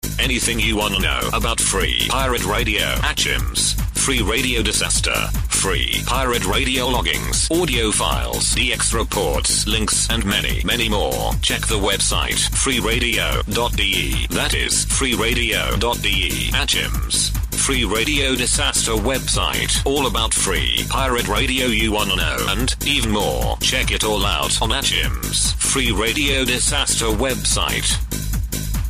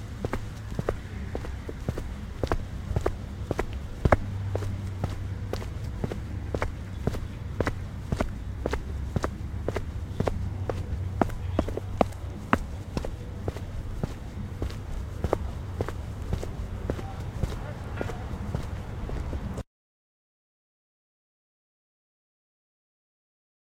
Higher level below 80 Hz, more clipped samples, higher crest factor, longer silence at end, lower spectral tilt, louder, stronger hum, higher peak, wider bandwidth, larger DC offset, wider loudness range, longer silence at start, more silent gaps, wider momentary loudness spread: first, -26 dBFS vs -36 dBFS; neither; second, 14 dB vs 32 dB; second, 0 s vs 4 s; second, -2.5 dB/octave vs -7 dB/octave; first, -18 LUFS vs -33 LUFS; neither; second, -6 dBFS vs 0 dBFS; about the same, 15.5 kHz vs 16 kHz; neither; second, 1 LU vs 6 LU; about the same, 0.05 s vs 0 s; neither; second, 3 LU vs 8 LU